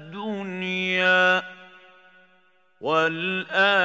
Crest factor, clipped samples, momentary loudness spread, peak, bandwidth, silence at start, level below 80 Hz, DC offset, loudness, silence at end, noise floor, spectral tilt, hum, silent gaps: 18 dB; under 0.1%; 14 LU; -6 dBFS; 8 kHz; 0 s; -82 dBFS; under 0.1%; -22 LUFS; 0 s; -62 dBFS; -4.5 dB/octave; none; none